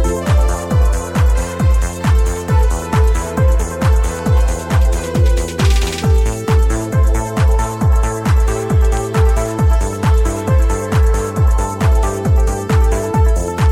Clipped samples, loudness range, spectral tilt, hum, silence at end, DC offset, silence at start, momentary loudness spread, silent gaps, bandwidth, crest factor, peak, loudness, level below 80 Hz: under 0.1%; 0 LU; -6 dB/octave; none; 0 s; under 0.1%; 0 s; 1 LU; none; 14 kHz; 10 dB; -2 dBFS; -15 LUFS; -14 dBFS